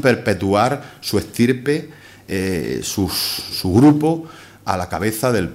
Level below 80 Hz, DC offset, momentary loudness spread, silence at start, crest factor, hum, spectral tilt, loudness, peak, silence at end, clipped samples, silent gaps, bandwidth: -46 dBFS; under 0.1%; 12 LU; 0 s; 18 dB; none; -5.5 dB/octave; -19 LUFS; 0 dBFS; 0 s; under 0.1%; none; 16 kHz